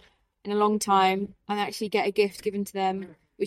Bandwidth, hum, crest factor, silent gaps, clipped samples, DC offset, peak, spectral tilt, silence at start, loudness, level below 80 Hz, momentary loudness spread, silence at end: 16 kHz; none; 16 dB; none; under 0.1%; under 0.1%; -10 dBFS; -4.5 dB/octave; 0.45 s; -26 LUFS; -66 dBFS; 10 LU; 0 s